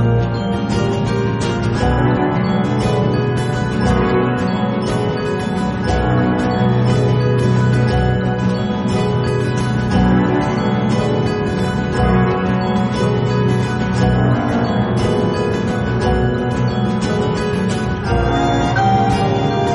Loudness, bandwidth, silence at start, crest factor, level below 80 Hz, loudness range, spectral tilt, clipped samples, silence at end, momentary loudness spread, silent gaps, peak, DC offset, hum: -17 LUFS; 11.5 kHz; 0 s; 12 dB; -30 dBFS; 1 LU; -7 dB/octave; under 0.1%; 0 s; 4 LU; none; -4 dBFS; under 0.1%; none